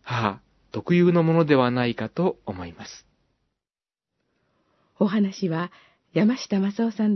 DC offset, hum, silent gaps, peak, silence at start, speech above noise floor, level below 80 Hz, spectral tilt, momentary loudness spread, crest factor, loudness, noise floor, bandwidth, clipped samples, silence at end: under 0.1%; none; none; -4 dBFS; 0.05 s; over 68 dB; -64 dBFS; -7.5 dB/octave; 17 LU; 20 dB; -23 LUFS; under -90 dBFS; 6.2 kHz; under 0.1%; 0 s